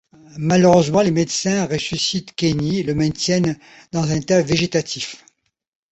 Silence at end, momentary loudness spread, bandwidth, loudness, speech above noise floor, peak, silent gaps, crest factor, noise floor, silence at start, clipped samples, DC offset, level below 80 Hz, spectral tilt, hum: 0.75 s; 12 LU; 8.2 kHz; -19 LUFS; 41 dB; -2 dBFS; none; 18 dB; -59 dBFS; 0.35 s; under 0.1%; under 0.1%; -48 dBFS; -5 dB/octave; none